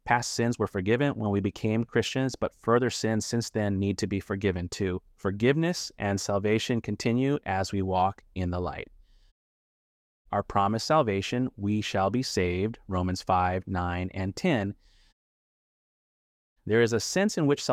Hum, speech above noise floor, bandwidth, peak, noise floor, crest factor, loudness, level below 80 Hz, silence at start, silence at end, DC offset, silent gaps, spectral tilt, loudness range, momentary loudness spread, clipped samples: none; over 63 dB; 15.5 kHz; -8 dBFS; under -90 dBFS; 20 dB; -28 LUFS; -54 dBFS; 0.05 s; 0 s; under 0.1%; 9.31-10.25 s, 15.13-16.56 s; -5.5 dB/octave; 4 LU; 7 LU; under 0.1%